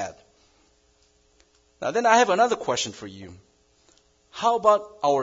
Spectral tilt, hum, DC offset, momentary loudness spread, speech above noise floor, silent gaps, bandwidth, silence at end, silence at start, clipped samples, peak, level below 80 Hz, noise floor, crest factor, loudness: -3 dB/octave; none; under 0.1%; 22 LU; 41 dB; none; 7.8 kHz; 0 s; 0 s; under 0.1%; -2 dBFS; -66 dBFS; -63 dBFS; 22 dB; -22 LUFS